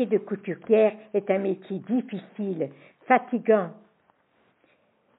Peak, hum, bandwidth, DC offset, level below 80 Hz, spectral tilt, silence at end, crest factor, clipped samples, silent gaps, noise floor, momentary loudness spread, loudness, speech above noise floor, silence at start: -6 dBFS; none; 3.9 kHz; under 0.1%; -86 dBFS; -2.5 dB/octave; 1.45 s; 20 dB; under 0.1%; none; -66 dBFS; 12 LU; -26 LUFS; 41 dB; 0 s